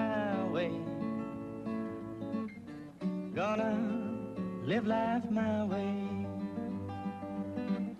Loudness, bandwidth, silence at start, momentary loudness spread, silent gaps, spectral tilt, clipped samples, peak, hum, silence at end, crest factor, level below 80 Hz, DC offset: -36 LUFS; 8.4 kHz; 0 s; 8 LU; none; -8 dB/octave; under 0.1%; -20 dBFS; none; 0 s; 14 dB; -66 dBFS; under 0.1%